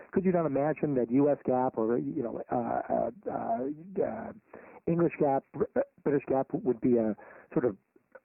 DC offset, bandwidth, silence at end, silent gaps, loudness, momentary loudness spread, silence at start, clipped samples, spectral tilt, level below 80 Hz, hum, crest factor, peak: under 0.1%; 2.9 kHz; 0.5 s; none; -30 LUFS; 9 LU; 0 s; under 0.1%; -5.5 dB/octave; -64 dBFS; none; 16 dB; -14 dBFS